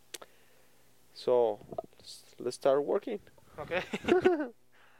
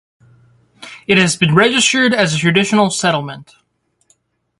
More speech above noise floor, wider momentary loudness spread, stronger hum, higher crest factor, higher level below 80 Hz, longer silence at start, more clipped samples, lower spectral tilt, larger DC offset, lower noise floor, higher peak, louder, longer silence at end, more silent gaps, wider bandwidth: second, 36 dB vs 46 dB; first, 21 LU vs 18 LU; neither; first, 22 dB vs 16 dB; second, -68 dBFS vs -54 dBFS; second, 0.15 s vs 0.8 s; neither; about the same, -5 dB/octave vs -4 dB/octave; neither; first, -66 dBFS vs -59 dBFS; second, -12 dBFS vs 0 dBFS; second, -31 LUFS vs -13 LUFS; second, 0.5 s vs 1.15 s; neither; first, 16 kHz vs 11.5 kHz